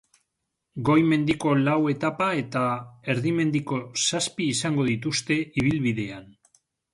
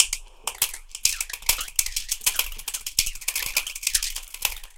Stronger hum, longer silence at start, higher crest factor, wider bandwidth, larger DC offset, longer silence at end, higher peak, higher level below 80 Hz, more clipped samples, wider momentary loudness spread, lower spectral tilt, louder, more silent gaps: neither; first, 0.75 s vs 0 s; second, 18 dB vs 28 dB; second, 11.5 kHz vs 17 kHz; neither; first, 0.7 s vs 0 s; second, -8 dBFS vs 0 dBFS; second, -56 dBFS vs -40 dBFS; neither; about the same, 8 LU vs 6 LU; first, -5 dB/octave vs 2.5 dB/octave; about the same, -24 LUFS vs -25 LUFS; neither